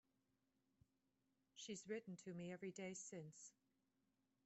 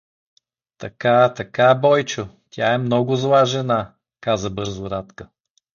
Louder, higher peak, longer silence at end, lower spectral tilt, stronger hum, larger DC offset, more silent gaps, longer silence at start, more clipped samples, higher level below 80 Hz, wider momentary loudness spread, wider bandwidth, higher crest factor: second, -54 LUFS vs -19 LUFS; second, -38 dBFS vs -2 dBFS; first, 0.95 s vs 0.5 s; about the same, -4.5 dB/octave vs -5.5 dB/octave; neither; neither; neither; first, 1.55 s vs 0.8 s; neither; second, under -90 dBFS vs -52 dBFS; second, 11 LU vs 16 LU; first, 8.2 kHz vs 7.2 kHz; about the same, 20 dB vs 18 dB